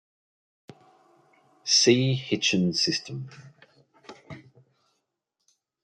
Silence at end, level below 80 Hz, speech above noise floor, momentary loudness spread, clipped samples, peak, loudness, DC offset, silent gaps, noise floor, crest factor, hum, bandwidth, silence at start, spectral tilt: 1.45 s; -70 dBFS; 56 dB; 26 LU; under 0.1%; -6 dBFS; -23 LUFS; under 0.1%; none; -80 dBFS; 22 dB; none; 11 kHz; 1.65 s; -3.5 dB/octave